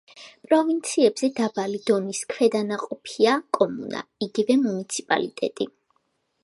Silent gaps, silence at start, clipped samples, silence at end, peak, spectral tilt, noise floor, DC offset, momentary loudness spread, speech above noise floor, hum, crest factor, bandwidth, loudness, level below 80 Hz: none; 0.15 s; under 0.1%; 0.75 s; -4 dBFS; -4 dB/octave; -71 dBFS; under 0.1%; 10 LU; 48 dB; none; 20 dB; 11.5 kHz; -24 LUFS; -74 dBFS